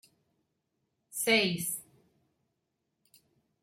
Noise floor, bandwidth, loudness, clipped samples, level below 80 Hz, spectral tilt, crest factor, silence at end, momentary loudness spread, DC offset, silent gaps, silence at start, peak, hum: -82 dBFS; 16.5 kHz; -29 LUFS; under 0.1%; -76 dBFS; -2.5 dB/octave; 22 dB; 1.8 s; 14 LU; under 0.1%; none; 1.15 s; -14 dBFS; none